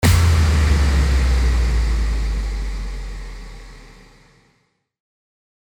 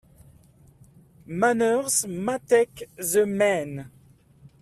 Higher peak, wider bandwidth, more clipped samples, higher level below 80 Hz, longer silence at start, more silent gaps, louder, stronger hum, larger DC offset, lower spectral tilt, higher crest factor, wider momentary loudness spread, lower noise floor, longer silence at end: first, -2 dBFS vs -8 dBFS; first, 19 kHz vs 15 kHz; neither; first, -20 dBFS vs -62 dBFS; second, 0 s vs 1.3 s; neither; first, -19 LUFS vs -23 LUFS; neither; neither; first, -5.5 dB/octave vs -4 dB/octave; about the same, 16 dB vs 18 dB; first, 20 LU vs 12 LU; first, -65 dBFS vs -55 dBFS; first, 1.9 s vs 0.15 s